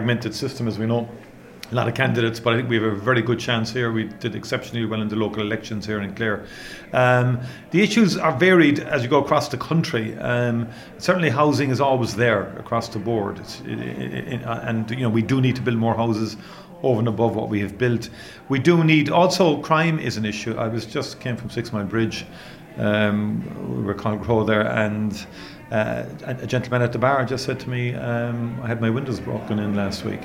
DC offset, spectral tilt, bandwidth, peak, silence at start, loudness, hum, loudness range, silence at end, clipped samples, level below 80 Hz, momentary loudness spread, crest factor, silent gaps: under 0.1%; -6 dB/octave; 16 kHz; -4 dBFS; 0 s; -22 LUFS; none; 6 LU; 0 s; under 0.1%; -52 dBFS; 11 LU; 18 dB; none